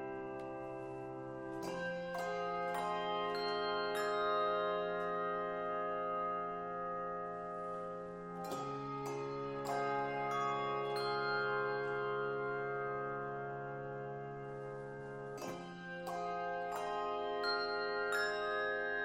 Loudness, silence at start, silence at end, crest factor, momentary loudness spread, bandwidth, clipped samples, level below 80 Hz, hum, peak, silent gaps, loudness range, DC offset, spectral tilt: -39 LUFS; 0 s; 0 s; 16 dB; 10 LU; 16 kHz; under 0.1%; -70 dBFS; none; -24 dBFS; none; 6 LU; under 0.1%; -5 dB/octave